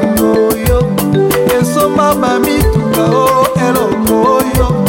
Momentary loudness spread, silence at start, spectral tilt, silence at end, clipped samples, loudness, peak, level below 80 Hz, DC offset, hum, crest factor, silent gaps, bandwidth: 2 LU; 0 s; -5.5 dB/octave; 0 s; under 0.1%; -11 LUFS; 0 dBFS; -24 dBFS; under 0.1%; none; 10 dB; none; 18 kHz